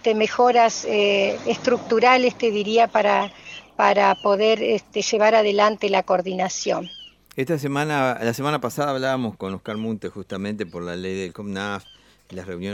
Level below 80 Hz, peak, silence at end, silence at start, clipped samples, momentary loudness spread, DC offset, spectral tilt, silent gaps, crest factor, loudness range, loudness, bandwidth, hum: -62 dBFS; -2 dBFS; 0 s; 0.05 s; under 0.1%; 14 LU; under 0.1%; -4 dB/octave; none; 18 dB; 8 LU; -21 LUFS; 16 kHz; none